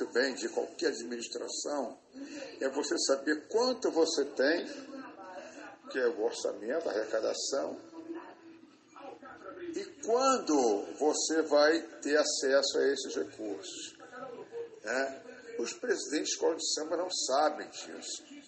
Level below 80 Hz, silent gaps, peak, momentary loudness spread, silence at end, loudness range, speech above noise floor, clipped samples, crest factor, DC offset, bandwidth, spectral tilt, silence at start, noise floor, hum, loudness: -82 dBFS; none; -14 dBFS; 18 LU; 0 s; 8 LU; 24 dB; under 0.1%; 20 dB; under 0.1%; 8.8 kHz; -1 dB/octave; 0 s; -56 dBFS; none; -32 LUFS